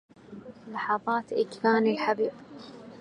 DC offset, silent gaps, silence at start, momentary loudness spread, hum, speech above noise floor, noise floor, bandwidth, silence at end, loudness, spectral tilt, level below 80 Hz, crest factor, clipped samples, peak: under 0.1%; none; 0.3 s; 22 LU; none; 18 dB; -46 dBFS; 10 kHz; 0 s; -27 LUFS; -6 dB/octave; -74 dBFS; 20 dB; under 0.1%; -10 dBFS